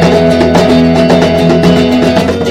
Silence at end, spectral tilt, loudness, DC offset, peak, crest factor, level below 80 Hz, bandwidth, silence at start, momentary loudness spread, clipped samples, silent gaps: 0 s; -6.5 dB/octave; -7 LUFS; under 0.1%; 0 dBFS; 6 dB; -28 dBFS; 15 kHz; 0 s; 2 LU; 1%; none